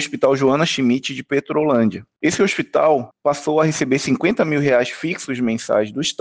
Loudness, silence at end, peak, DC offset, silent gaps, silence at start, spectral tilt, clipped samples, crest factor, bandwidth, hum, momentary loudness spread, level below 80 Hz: -18 LUFS; 0.1 s; -4 dBFS; under 0.1%; none; 0 s; -5 dB/octave; under 0.1%; 14 dB; 10 kHz; none; 6 LU; -60 dBFS